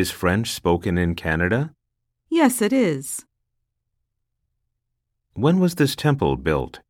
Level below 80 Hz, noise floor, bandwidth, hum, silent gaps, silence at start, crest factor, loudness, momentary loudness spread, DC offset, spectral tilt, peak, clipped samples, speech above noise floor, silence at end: -44 dBFS; -77 dBFS; 17.5 kHz; none; none; 0 s; 18 dB; -21 LUFS; 8 LU; under 0.1%; -5.5 dB/octave; -4 dBFS; under 0.1%; 57 dB; 0.1 s